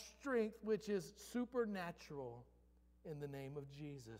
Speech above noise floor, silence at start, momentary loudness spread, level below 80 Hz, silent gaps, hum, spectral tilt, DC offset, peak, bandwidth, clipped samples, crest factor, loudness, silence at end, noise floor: 26 dB; 0 s; 12 LU; -72 dBFS; none; none; -6 dB/octave; under 0.1%; -28 dBFS; 16 kHz; under 0.1%; 18 dB; -45 LUFS; 0 s; -70 dBFS